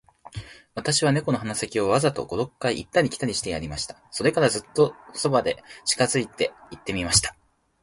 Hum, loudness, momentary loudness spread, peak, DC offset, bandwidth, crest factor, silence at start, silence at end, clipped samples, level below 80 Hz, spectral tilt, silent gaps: none; -24 LUFS; 11 LU; -4 dBFS; under 0.1%; 11.5 kHz; 22 dB; 0.25 s; 0.5 s; under 0.1%; -48 dBFS; -3.5 dB/octave; none